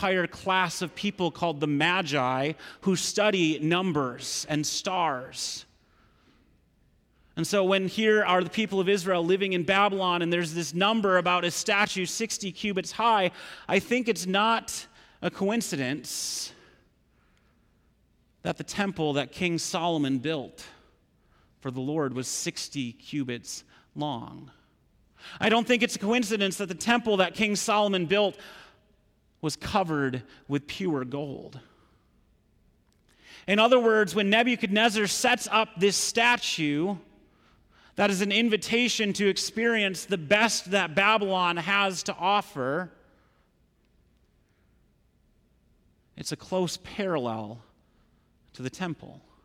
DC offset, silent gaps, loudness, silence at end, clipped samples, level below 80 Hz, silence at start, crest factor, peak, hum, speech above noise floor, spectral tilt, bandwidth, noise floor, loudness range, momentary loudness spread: under 0.1%; none; -26 LUFS; 0.25 s; under 0.1%; -64 dBFS; 0 s; 18 dB; -10 dBFS; none; 40 dB; -3.5 dB/octave; 16.5 kHz; -66 dBFS; 10 LU; 13 LU